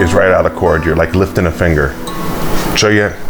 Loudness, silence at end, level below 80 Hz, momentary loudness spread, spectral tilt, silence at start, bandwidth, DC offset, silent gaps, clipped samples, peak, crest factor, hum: -13 LUFS; 0 s; -24 dBFS; 8 LU; -5 dB/octave; 0 s; over 20 kHz; under 0.1%; none; under 0.1%; 0 dBFS; 12 dB; none